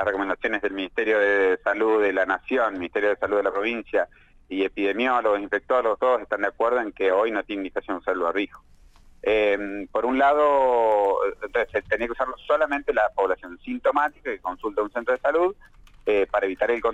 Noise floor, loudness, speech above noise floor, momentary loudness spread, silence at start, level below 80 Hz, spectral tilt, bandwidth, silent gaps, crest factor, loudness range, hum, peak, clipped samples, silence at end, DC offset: -49 dBFS; -24 LUFS; 26 dB; 9 LU; 0 s; -52 dBFS; -5.5 dB/octave; 8 kHz; none; 16 dB; 3 LU; none; -8 dBFS; under 0.1%; 0 s; under 0.1%